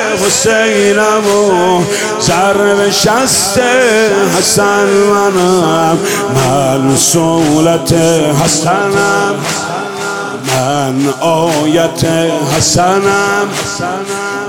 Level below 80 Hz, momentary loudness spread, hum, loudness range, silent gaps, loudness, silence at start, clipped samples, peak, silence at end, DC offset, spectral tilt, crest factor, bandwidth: -42 dBFS; 7 LU; none; 4 LU; none; -10 LUFS; 0 s; under 0.1%; 0 dBFS; 0 s; under 0.1%; -3.5 dB/octave; 10 dB; 18 kHz